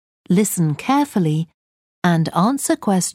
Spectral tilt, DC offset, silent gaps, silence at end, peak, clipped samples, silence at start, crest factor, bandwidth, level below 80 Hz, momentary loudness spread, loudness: -5.5 dB/octave; under 0.1%; 1.54-2.02 s; 0.05 s; -2 dBFS; under 0.1%; 0.3 s; 16 dB; 16.5 kHz; -62 dBFS; 5 LU; -19 LUFS